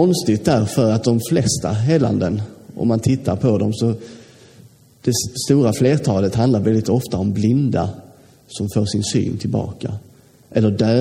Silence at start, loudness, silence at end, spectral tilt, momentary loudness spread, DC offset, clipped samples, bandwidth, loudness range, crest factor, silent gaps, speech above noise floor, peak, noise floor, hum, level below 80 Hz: 0 s; -18 LUFS; 0 s; -6.5 dB/octave; 11 LU; under 0.1%; under 0.1%; 16 kHz; 4 LU; 16 dB; none; 30 dB; -2 dBFS; -47 dBFS; none; -48 dBFS